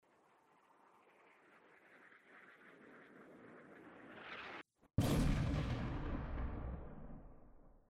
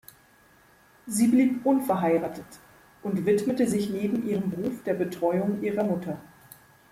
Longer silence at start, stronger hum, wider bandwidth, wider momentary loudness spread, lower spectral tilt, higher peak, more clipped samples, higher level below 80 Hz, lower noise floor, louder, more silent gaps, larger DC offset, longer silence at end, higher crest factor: first, 1.9 s vs 1.05 s; neither; about the same, 16 kHz vs 16 kHz; first, 25 LU vs 9 LU; about the same, -6.5 dB/octave vs -6.5 dB/octave; second, -24 dBFS vs -12 dBFS; neither; first, -50 dBFS vs -64 dBFS; first, -72 dBFS vs -58 dBFS; second, -42 LUFS vs -26 LUFS; neither; neither; second, 0.15 s vs 0.65 s; about the same, 20 dB vs 16 dB